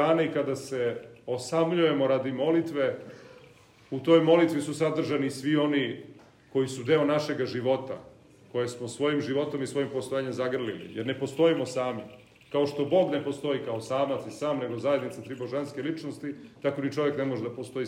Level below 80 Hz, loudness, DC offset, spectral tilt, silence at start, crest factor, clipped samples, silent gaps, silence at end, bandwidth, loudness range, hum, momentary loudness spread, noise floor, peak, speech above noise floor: -74 dBFS; -28 LUFS; under 0.1%; -6 dB/octave; 0 s; 20 dB; under 0.1%; none; 0 s; 15.5 kHz; 5 LU; none; 11 LU; -55 dBFS; -8 dBFS; 27 dB